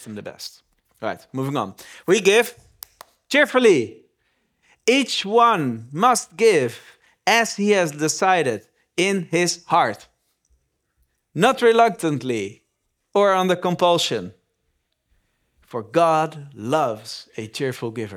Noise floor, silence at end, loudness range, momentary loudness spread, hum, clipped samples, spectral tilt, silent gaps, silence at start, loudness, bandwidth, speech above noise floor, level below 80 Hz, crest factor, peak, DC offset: -73 dBFS; 0 s; 4 LU; 17 LU; none; under 0.1%; -4 dB/octave; none; 0 s; -20 LUFS; 19.5 kHz; 54 dB; -70 dBFS; 22 dB; 0 dBFS; under 0.1%